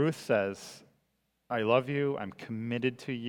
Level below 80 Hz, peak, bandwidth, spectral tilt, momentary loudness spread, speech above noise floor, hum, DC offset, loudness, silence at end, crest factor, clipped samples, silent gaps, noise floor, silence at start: -76 dBFS; -12 dBFS; 17.5 kHz; -6.5 dB/octave; 11 LU; 46 dB; none; under 0.1%; -31 LUFS; 0 s; 20 dB; under 0.1%; none; -77 dBFS; 0 s